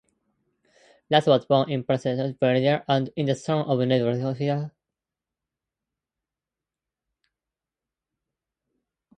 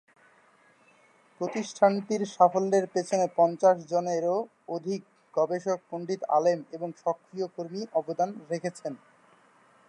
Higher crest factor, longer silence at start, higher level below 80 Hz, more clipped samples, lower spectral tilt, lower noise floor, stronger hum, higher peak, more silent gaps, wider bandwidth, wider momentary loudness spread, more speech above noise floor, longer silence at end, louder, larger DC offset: about the same, 22 dB vs 22 dB; second, 1.1 s vs 1.4 s; first, -68 dBFS vs -84 dBFS; neither; first, -7 dB/octave vs -5.5 dB/octave; first, -89 dBFS vs -61 dBFS; neither; about the same, -4 dBFS vs -6 dBFS; neither; second, 9.4 kHz vs 11 kHz; second, 7 LU vs 12 LU; first, 66 dB vs 34 dB; first, 4.5 s vs 0.95 s; first, -24 LUFS vs -28 LUFS; neither